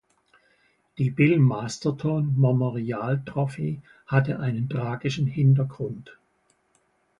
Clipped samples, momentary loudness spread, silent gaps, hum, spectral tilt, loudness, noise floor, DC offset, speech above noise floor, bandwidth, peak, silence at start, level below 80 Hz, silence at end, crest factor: under 0.1%; 11 LU; none; none; -7.5 dB/octave; -25 LUFS; -68 dBFS; under 0.1%; 44 dB; 7.8 kHz; -6 dBFS; 1 s; -60 dBFS; 1.05 s; 18 dB